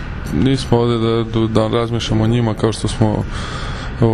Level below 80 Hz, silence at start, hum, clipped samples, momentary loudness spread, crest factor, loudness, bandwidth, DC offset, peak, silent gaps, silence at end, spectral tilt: -30 dBFS; 0 s; none; under 0.1%; 9 LU; 16 dB; -17 LUFS; 11.5 kHz; under 0.1%; 0 dBFS; none; 0 s; -6.5 dB/octave